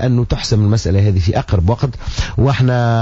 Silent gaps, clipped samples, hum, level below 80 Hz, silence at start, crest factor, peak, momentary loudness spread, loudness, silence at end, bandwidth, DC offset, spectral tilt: none; under 0.1%; none; -28 dBFS; 0 s; 10 dB; -4 dBFS; 6 LU; -15 LUFS; 0 s; 8 kHz; under 0.1%; -7 dB/octave